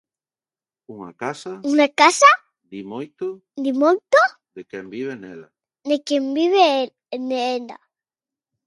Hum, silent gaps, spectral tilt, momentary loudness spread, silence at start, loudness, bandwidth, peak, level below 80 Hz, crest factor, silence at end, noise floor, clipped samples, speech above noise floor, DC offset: none; none; -2.5 dB/octave; 22 LU; 0.9 s; -19 LUFS; 11.5 kHz; 0 dBFS; -76 dBFS; 20 dB; 0.9 s; under -90 dBFS; under 0.1%; over 71 dB; under 0.1%